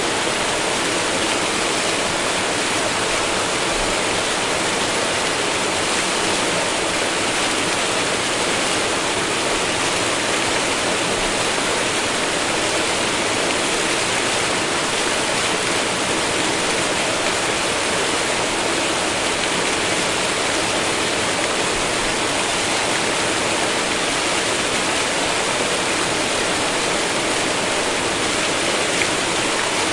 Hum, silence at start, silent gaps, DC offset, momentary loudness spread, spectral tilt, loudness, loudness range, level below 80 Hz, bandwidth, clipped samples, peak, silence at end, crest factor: none; 0 s; none; under 0.1%; 1 LU; -1.5 dB/octave; -18 LUFS; 0 LU; -44 dBFS; 11.5 kHz; under 0.1%; -4 dBFS; 0 s; 16 dB